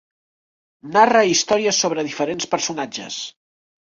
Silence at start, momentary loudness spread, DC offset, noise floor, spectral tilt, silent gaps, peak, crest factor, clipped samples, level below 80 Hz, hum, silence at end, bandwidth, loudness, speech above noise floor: 0.85 s; 14 LU; under 0.1%; under -90 dBFS; -2.5 dB/octave; none; -2 dBFS; 20 dB; under 0.1%; -64 dBFS; none; 0.7 s; 7.8 kHz; -19 LUFS; over 71 dB